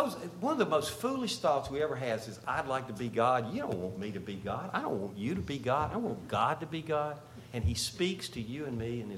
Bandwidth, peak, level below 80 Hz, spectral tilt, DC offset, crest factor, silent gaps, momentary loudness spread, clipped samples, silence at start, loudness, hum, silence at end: 16.5 kHz; -14 dBFS; -52 dBFS; -5 dB/octave; under 0.1%; 20 dB; none; 8 LU; under 0.1%; 0 s; -34 LUFS; none; 0 s